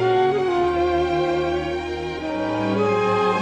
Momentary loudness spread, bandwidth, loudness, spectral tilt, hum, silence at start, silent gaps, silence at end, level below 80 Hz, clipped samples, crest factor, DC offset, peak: 7 LU; 8.8 kHz; -21 LUFS; -6.5 dB/octave; none; 0 s; none; 0 s; -42 dBFS; under 0.1%; 12 dB; under 0.1%; -8 dBFS